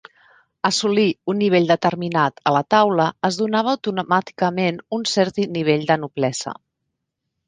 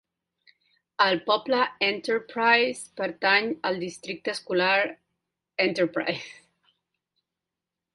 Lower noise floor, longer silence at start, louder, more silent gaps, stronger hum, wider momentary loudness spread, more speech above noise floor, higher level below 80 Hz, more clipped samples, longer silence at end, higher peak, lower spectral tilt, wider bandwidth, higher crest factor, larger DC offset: second, -78 dBFS vs -87 dBFS; second, 0.65 s vs 1 s; first, -20 LUFS vs -25 LUFS; neither; neither; second, 7 LU vs 11 LU; about the same, 59 dB vs 62 dB; first, -64 dBFS vs -72 dBFS; neither; second, 0.95 s vs 1.65 s; first, -2 dBFS vs -6 dBFS; first, -5 dB/octave vs -3.5 dB/octave; second, 9.8 kHz vs 11.5 kHz; about the same, 18 dB vs 20 dB; neither